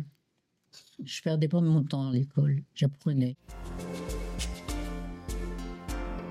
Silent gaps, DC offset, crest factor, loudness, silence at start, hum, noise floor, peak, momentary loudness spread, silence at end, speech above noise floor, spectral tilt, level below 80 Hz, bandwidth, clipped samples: none; under 0.1%; 14 dB; -31 LUFS; 0 s; none; -76 dBFS; -16 dBFS; 14 LU; 0 s; 49 dB; -7 dB/octave; -42 dBFS; 14.5 kHz; under 0.1%